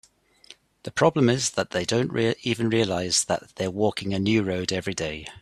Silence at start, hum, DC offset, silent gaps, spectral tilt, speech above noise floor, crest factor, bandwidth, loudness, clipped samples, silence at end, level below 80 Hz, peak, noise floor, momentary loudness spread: 0.5 s; none; under 0.1%; none; -4.5 dB/octave; 28 dB; 20 dB; 13.5 kHz; -24 LUFS; under 0.1%; 0 s; -56 dBFS; -4 dBFS; -53 dBFS; 8 LU